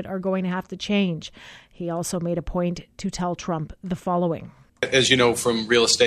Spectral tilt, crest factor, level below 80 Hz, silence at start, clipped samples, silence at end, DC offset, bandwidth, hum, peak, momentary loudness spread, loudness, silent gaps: -4 dB/octave; 20 dB; -46 dBFS; 0 s; under 0.1%; 0 s; under 0.1%; 14 kHz; none; -2 dBFS; 14 LU; -23 LUFS; none